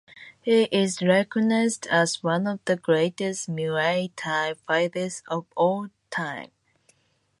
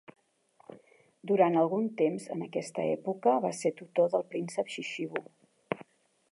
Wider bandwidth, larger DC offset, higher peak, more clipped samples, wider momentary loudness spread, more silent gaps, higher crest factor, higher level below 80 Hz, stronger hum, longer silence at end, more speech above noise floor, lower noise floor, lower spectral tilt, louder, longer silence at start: about the same, 11.5 kHz vs 11.5 kHz; neither; about the same, -8 dBFS vs -10 dBFS; neither; second, 10 LU vs 13 LU; neither; about the same, 18 dB vs 22 dB; first, -72 dBFS vs -84 dBFS; neither; first, 0.95 s vs 0.5 s; first, 44 dB vs 37 dB; about the same, -68 dBFS vs -66 dBFS; second, -4.5 dB/octave vs -6 dB/octave; first, -25 LUFS vs -31 LUFS; second, 0.15 s vs 0.7 s